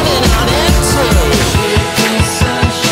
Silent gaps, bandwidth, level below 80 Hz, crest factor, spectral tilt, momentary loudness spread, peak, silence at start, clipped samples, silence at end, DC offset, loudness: none; 16.5 kHz; -18 dBFS; 10 dB; -4 dB/octave; 2 LU; 0 dBFS; 0 s; under 0.1%; 0 s; under 0.1%; -11 LUFS